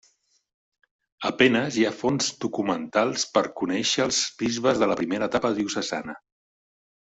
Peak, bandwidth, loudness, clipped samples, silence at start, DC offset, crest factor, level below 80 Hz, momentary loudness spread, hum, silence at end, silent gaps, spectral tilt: -4 dBFS; 8.2 kHz; -24 LUFS; under 0.1%; 1.2 s; under 0.1%; 22 dB; -62 dBFS; 9 LU; none; 0.85 s; none; -3.5 dB/octave